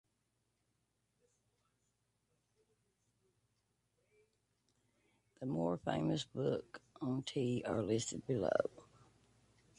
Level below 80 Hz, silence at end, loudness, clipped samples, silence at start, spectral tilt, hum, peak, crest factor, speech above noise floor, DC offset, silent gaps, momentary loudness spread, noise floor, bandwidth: -72 dBFS; 0.95 s; -39 LUFS; under 0.1%; 5.4 s; -5.5 dB/octave; none; -18 dBFS; 26 dB; 45 dB; under 0.1%; none; 8 LU; -83 dBFS; 11.5 kHz